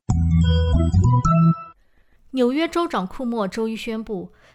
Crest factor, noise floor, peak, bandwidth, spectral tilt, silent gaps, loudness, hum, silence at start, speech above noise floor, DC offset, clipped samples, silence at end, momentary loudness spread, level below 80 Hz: 12 dB; -56 dBFS; -8 dBFS; 11 kHz; -7.5 dB/octave; none; -20 LUFS; none; 0.1 s; 36 dB; under 0.1%; under 0.1%; 0.25 s; 11 LU; -32 dBFS